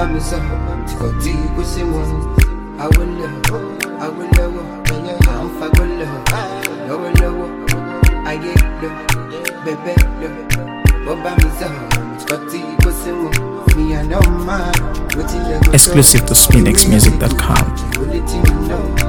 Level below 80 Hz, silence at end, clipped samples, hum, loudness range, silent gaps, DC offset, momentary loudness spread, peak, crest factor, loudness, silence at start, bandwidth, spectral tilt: -18 dBFS; 0 s; 0.3%; none; 8 LU; none; under 0.1%; 14 LU; 0 dBFS; 14 dB; -15 LUFS; 0 s; over 20 kHz; -4 dB/octave